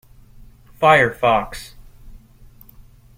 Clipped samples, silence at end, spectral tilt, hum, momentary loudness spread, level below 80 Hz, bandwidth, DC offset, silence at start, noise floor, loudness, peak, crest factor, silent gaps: under 0.1%; 1 s; -5 dB/octave; none; 22 LU; -44 dBFS; 16.5 kHz; under 0.1%; 0.8 s; -46 dBFS; -16 LUFS; -2 dBFS; 20 dB; none